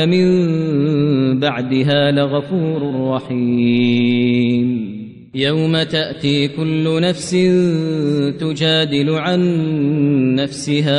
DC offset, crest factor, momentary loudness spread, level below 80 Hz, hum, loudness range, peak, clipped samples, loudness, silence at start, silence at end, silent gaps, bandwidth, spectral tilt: under 0.1%; 12 dB; 5 LU; -54 dBFS; none; 1 LU; -4 dBFS; under 0.1%; -16 LUFS; 0 s; 0 s; none; 10.5 kHz; -6.5 dB/octave